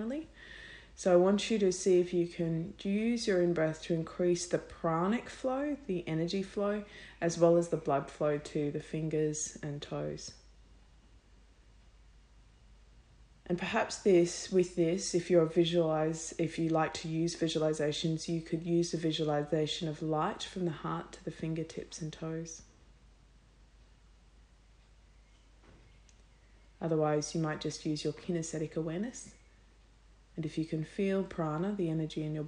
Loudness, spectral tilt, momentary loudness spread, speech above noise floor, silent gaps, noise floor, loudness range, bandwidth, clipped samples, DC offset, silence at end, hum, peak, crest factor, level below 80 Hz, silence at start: -33 LUFS; -5.5 dB/octave; 12 LU; 29 dB; none; -61 dBFS; 12 LU; 10.5 kHz; under 0.1%; under 0.1%; 0 s; none; -12 dBFS; 22 dB; -60 dBFS; 0 s